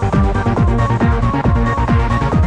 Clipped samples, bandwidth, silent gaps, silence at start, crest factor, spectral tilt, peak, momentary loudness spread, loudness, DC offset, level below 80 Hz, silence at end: under 0.1%; 9.2 kHz; none; 0 s; 12 dB; -8 dB/octave; -2 dBFS; 1 LU; -15 LUFS; under 0.1%; -20 dBFS; 0 s